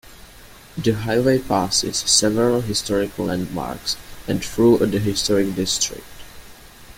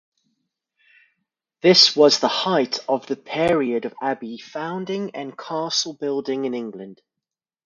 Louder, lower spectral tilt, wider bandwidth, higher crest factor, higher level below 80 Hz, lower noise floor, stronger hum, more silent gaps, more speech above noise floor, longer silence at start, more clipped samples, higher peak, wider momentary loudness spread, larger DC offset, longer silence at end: about the same, -20 LUFS vs -20 LUFS; about the same, -4 dB/octave vs -3.5 dB/octave; first, 17 kHz vs 11 kHz; about the same, 18 dB vs 22 dB; first, -44 dBFS vs -62 dBFS; second, -44 dBFS vs -86 dBFS; neither; neither; second, 24 dB vs 65 dB; second, 0.05 s vs 1.65 s; neither; about the same, -2 dBFS vs 0 dBFS; second, 10 LU vs 18 LU; neither; second, 0.05 s vs 0.75 s